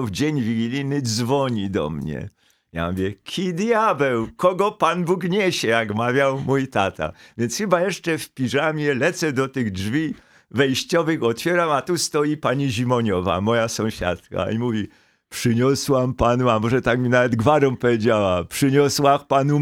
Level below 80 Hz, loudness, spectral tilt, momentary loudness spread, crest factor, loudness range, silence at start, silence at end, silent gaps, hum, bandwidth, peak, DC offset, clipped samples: -48 dBFS; -21 LUFS; -5.5 dB/octave; 8 LU; 18 dB; 4 LU; 0 s; 0 s; none; none; 17.5 kHz; -2 dBFS; under 0.1%; under 0.1%